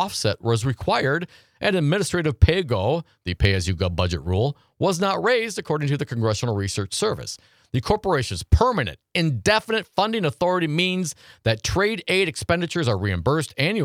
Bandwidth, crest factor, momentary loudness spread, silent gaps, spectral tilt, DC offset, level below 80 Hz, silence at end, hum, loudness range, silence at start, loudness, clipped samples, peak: 15.5 kHz; 20 dB; 6 LU; none; -5 dB/octave; under 0.1%; -36 dBFS; 0 s; none; 2 LU; 0 s; -23 LUFS; under 0.1%; -2 dBFS